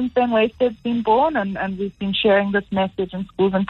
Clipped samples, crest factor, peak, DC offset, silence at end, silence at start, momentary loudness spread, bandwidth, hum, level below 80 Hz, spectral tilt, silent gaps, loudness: under 0.1%; 14 dB; -6 dBFS; under 0.1%; 0 s; 0 s; 9 LU; 5.4 kHz; none; -50 dBFS; -8 dB/octave; none; -20 LUFS